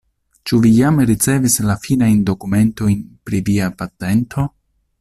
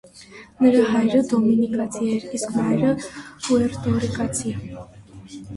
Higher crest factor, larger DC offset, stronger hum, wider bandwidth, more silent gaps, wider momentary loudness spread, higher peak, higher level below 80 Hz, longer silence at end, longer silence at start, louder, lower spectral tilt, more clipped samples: about the same, 14 dB vs 16 dB; neither; neither; first, 14.5 kHz vs 11.5 kHz; neither; second, 10 LU vs 18 LU; first, -2 dBFS vs -6 dBFS; first, -42 dBFS vs -50 dBFS; first, 0.5 s vs 0 s; first, 0.45 s vs 0.15 s; first, -16 LUFS vs -21 LUFS; about the same, -5.5 dB/octave vs -6 dB/octave; neither